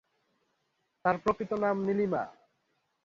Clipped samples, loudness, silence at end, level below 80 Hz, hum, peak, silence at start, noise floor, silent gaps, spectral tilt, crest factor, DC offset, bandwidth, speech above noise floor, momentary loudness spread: under 0.1%; -30 LUFS; 0.75 s; -64 dBFS; none; -14 dBFS; 1.05 s; -78 dBFS; none; -8 dB/octave; 20 dB; under 0.1%; 7.4 kHz; 48 dB; 5 LU